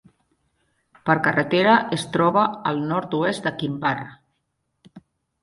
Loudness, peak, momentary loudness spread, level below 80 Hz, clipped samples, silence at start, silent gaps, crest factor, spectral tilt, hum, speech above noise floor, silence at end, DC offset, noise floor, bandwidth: -21 LUFS; -2 dBFS; 9 LU; -62 dBFS; under 0.1%; 1.05 s; none; 20 dB; -6 dB/octave; none; 53 dB; 0.45 s; under 0.1%; -74 dBFS; 11.5 kHz